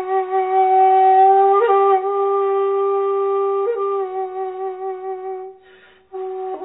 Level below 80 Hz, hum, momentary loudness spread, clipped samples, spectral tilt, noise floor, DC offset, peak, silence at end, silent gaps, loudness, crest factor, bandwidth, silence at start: -72 dBFS; 60 Hz at -70 dBFS; 16 LU; under 0.1%; -7.5 dB/octave; -49 dBFS; under 0.1%; -4 dBFS; 0 s; none; -17 LUFS; 12 dB; 4 kHz; 0 s